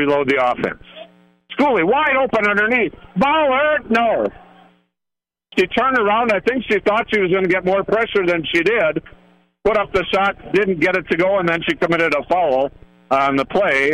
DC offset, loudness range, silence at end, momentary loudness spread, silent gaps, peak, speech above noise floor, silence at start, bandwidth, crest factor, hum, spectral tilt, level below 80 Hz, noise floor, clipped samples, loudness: under 0.1%; 2 LU; 0 s; 5 LU; none; -6 dBFS; 67 dB; 0 s; 11.5 kHz; 12 dB; none; -6 dB/octave; -48 dBFS; -84 dBFS; under 0.1%; -17 LUFS